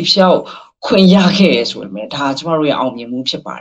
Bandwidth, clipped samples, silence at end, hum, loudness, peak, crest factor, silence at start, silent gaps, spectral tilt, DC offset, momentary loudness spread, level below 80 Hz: 7.8 kHz; under 0.1%; 0 s; none; -13 LUFS; 0 dBFS; 14 dB; 0 s; none; -6 dB/octave; under 0.1%; 14 LU; -52 dBFS